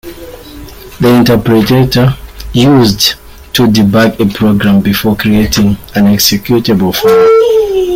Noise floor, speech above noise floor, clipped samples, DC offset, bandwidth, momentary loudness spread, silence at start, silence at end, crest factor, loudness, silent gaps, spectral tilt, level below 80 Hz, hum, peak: -28 dBFS; 21 dB; under 0.1%; under 0.1%; 16.5 kHz; 9 LU; 0.05 s; 0 s; 8 dB; -8 LUFS; none; -5.5 dB/octave; -30 dBFS; none; 0 dBFS